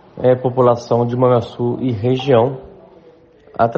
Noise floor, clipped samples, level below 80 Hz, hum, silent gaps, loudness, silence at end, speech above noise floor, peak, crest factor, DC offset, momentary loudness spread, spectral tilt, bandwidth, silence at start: -46 dBFS; under 0.1%; -52 dBFS; none; none; -16 LUFS; 0 s; 31 dB; 0 dBFS; 16 dB; under 0.1%; 7 LU; -8.5 dB/octave; 7.2 kHz; 0.15 s